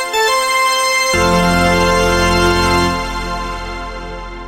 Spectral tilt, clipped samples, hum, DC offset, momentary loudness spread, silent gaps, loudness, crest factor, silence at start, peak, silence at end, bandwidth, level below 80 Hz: -3.5 dB/octave; under 0.1%; none; under 0.1%; 13 LU; none; -13 LUFS; 12 dB; 0 s; -2 dBFS; 0 s; 16 kHz; -26 dBFS